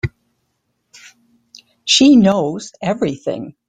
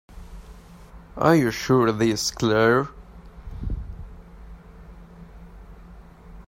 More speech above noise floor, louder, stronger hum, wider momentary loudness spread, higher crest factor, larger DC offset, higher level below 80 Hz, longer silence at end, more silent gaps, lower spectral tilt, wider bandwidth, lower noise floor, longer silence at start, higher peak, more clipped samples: first, 55 dB vs 25 dB; first, -14 LUFS vs -21 LUFS; neither; second, 16 LU vs 26 LU; about the same, 16 dB vs 20 dB; neither; second, -50 dBFS vs -40 dBFS; first, 0.2 s vs 0.05 s; neither; about the same, -4.5 dB/octave vs -5.5 dB/octave; second, 9.4 kHz vs 16 kHz; first, -69 dBFS vs -45 dBFS; about the same, 0.05 s vs 0.1 s; about the same, -2 dBFS vs -4 dBFS; neither